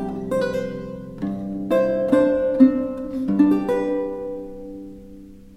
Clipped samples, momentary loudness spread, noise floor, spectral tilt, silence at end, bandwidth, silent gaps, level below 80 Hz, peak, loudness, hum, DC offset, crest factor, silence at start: under 0.1%; 19 LU; -42 dBFS; -8 dB/octave; 0 s; 12.5 kHz; none; -48 dBFS; -2 dBFS; -21 LUFS; none; under 0.1%; 18 dB; 0 s